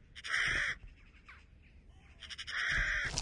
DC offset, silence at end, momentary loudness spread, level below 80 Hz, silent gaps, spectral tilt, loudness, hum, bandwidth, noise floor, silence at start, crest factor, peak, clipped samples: under 0.1%; 0 s; 14 LU; -50 dBFS; none; -1.5 dB/octave; -34 LUFS; none; 11.5 kHz; -59 dBFS; 0 s; 24 dB; -14 dBFS; under 0.1%